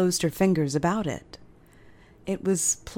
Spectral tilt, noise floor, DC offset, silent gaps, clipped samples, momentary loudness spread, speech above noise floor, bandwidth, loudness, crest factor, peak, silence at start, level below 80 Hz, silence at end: -4.5 dB/octave; -52 dBFS; under 0.1%; none; under 0.1%; 11 LU; 27 dB; 17.5 kHz; -25 LUFS; 18 dB; -8 dBFS; 0 s; -52 dBFS; 0 s